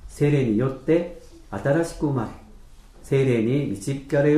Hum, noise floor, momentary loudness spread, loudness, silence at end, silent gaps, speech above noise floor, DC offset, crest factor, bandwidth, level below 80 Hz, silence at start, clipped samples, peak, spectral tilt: none; -45 dBFS; 9 LU; -23 LUFS; 0 s; none; 24 dB; under 0.1%; 14 dB; 12.5 kHz; -46 dBFS; 0.05 s; under 0.1%; -8 dBFS; -7.5 dB/octave